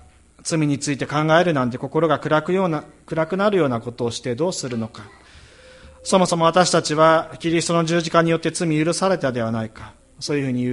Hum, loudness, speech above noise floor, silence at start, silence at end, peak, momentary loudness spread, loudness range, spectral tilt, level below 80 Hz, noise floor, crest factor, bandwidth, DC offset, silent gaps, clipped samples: none; -20 LUFS; 26 dB; 0.45 s; 0 s; -2 dBFS; 11 LU; 5 LU; -5 dB/octave; -54 dBFS; -46 dBFS; 20 dB; 11.5 kHz; under 0.1%; none; under 0.1%